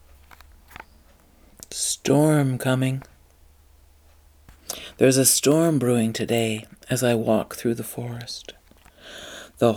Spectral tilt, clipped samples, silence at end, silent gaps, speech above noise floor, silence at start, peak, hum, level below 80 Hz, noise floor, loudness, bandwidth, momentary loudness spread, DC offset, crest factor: -4.5 dB/octave; under 0.1%; 0 s; none; 33 dB; 1.7 s; -2 dBFS; none; -56 dBFS; -54 dBFS; -22 LUFS; over 20 kHz; 20 LU; under 0.1%; 22 dB